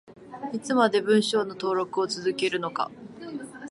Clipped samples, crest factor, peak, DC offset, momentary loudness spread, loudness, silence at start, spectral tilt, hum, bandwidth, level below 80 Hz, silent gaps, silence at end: under 0.1%; 20 dB; -8 dBFS; under 0.1%; 16 LU; -26 LUFS; 0.05 s; -4.5 dB/octave; none; 11.5 kHz; -72 dBFS; none; 0 s